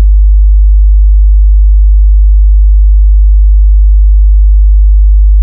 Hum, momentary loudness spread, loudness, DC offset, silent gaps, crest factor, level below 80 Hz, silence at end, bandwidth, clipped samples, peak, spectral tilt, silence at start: none; 0 LU; -8 LUFS; under 0.1%; none; 4 dB; -4 dBFS; 0 s; 0.1 kHz; 0.3%; 0 dBFS; -19.5 dB/octave; 0 s